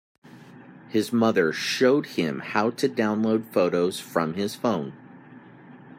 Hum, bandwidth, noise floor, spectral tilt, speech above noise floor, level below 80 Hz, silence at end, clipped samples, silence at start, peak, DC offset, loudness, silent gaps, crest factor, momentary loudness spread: none; 16 kHz; -47 dBFS; -5 dB/octave; 24 dB; -70 dBFS; 0.05 s; under 0.1%; 0.35 s; -8 dBFS; under 0.1%; -24 LUFS; none; 18 dB; 7 LU